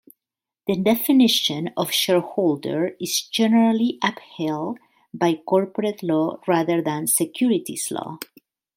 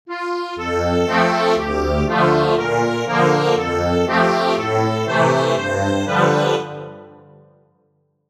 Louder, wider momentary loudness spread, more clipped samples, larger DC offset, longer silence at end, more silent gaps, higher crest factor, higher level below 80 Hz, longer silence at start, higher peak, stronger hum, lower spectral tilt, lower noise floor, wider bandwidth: second, -21 LUFS vs -18 LUFS; first, 12 LU vs 8 LU; neither; neither; second, 0.55 s vs 1.2 s; neither; about the same, 16 dB vs 16 dB; second, -68 dBFS vs -38 dBFS; first, 0.65 s vs 0.05 s; second, -6 dBFS vs -2 dBFS; neither; second, -4 dB/octave vs -5.5 dB/octave; first, -88 dBFS vs -64 dBFS; first, 16.5 kHz vs 14 kHz